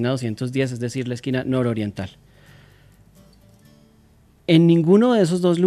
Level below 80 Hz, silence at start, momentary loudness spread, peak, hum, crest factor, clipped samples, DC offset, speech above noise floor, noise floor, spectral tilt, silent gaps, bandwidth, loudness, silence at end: -60 dBFS; 0 s; 14 LU; -4 dBFS; none; 18 dB; under 0.1%; under 0.1%; 35 dB; -54 dBFS; -7 dB/octave; none; 12 kHz; -19 LUFS; 0 s